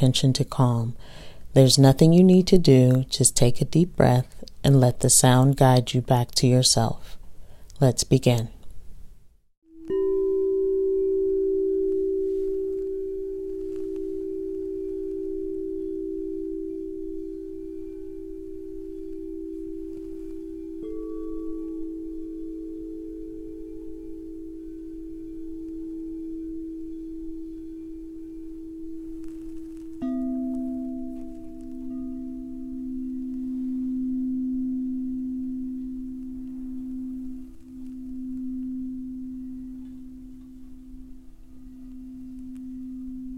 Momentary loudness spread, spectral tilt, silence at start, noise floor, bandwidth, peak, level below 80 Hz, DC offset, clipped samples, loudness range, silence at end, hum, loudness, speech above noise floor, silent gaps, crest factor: 21 LU; -5.5 dB/octave; 0 s; -49 dBFS; 15 kHz; -2 dBFS; -44 dBFS; under 0.1%; under 0.1%; 18 LU; 0 s; none; -24 LUFS; 31 dB; 9.57-9.62 s; 22 dB